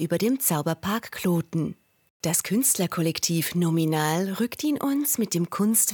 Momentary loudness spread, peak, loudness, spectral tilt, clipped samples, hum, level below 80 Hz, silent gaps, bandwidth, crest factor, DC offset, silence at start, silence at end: 6 LU; -8 dBFS; -24 LUFS; -4.5 dB/octave; under 0.1%; none; -64 dBFS; 2.10-2.20 s; 19 kHz; 18 dB; under 0.1%; 0 s; 0 s